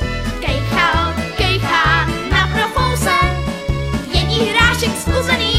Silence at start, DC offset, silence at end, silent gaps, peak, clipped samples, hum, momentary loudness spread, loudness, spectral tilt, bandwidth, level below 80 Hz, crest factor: 0 s; under 0.1%; 0 s; none; 0 dBFS; under 0.1%; none; 8 LU; -16 LUFS; -4.5 dB/octave; 16 kHz; -24 dBFS; 16 dB